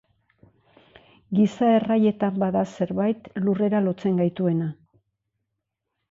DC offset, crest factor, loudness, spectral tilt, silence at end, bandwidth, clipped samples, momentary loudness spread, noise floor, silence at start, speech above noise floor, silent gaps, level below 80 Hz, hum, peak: under 0.1%; 16 dB; -23 LUFS; -8.5 dB/octave; 1.4 s; 7.6 kHz; under 0.1%; 7 LU; -81 dBFS; 1.3 s; 59 dB; none; -64 dBFS; none; -10 dBFS